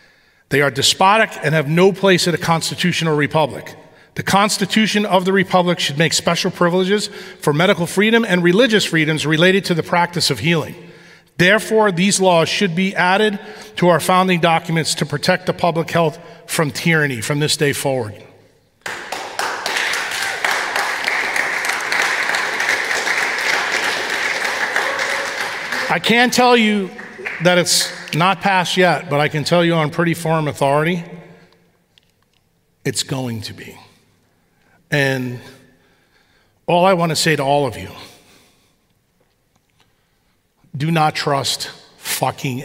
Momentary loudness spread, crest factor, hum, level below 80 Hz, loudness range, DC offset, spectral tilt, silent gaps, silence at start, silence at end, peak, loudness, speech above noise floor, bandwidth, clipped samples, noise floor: 11 LU; 16 dB; none; -60 dBFS; 9 LU; under 0.1%; -4 dB/octave; none; 0.5 s; 0 s; 0 dBFS; -16 LUFS; 46 dB; 16 kHz; under 0.1%; -62 dBFS